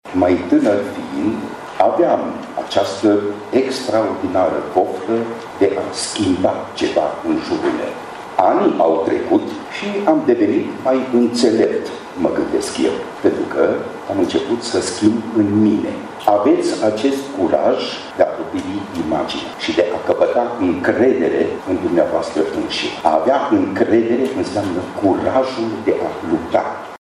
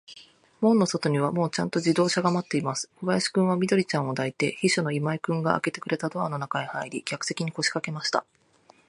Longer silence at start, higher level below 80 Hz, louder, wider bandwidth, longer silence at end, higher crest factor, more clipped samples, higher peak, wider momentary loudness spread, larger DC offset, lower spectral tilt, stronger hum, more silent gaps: about the same, 0.05 s vs 0.1 s; first, -52 dBFS vs -70 dBFS; first, -18 LUFS vs -26 LUFS; first, 12.5 kHz vs 11 kHz; second, 0.05 s vs 0.7 s; second, 16 dB vs 22 dB; neither; first, 0 dBFS vs -4 dBFS; about the same, 8 LU vs 7 LU; neither; about the same, -5 dB/octave vs -5 dB/octave; neither; neither